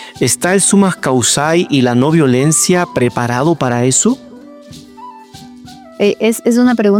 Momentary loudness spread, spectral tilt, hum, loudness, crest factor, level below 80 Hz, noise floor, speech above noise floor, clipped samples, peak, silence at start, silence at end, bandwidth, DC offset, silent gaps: 5 LU; -4.5 dB/octave; none; -12 LUFS; 12 dB; -52 dBFS; -35 dBFS; 24 dB; under 0.1%; 0 dBFS; 0 s; 0 s; 16.5 kHz; under 0.1%; none